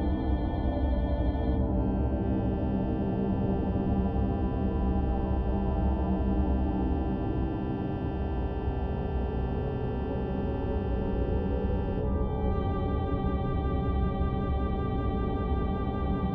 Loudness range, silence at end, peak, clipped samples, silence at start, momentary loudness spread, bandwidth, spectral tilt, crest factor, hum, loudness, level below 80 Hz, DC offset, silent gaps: 3 LU; 0 s; -14 dBFS; under 0.1%; 0 s; 3 LU; 4.3 kHz; -11 dB/octave; 14 dB; none; -30 LUFS; -32 dBFS; under 0.1%; none